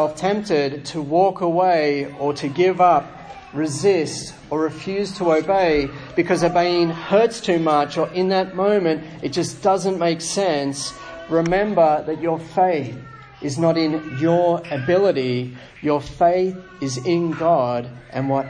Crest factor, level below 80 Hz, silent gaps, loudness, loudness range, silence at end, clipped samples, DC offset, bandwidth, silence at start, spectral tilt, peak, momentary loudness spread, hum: 16 dB; -50 dBFS; none; -20 LUFS; 2 LU; 0 s; under 0.1%; under 0.1%; 10.5 kHz; 0 s; -5.5 dB/octave; -4 dBFS; 10 LU; none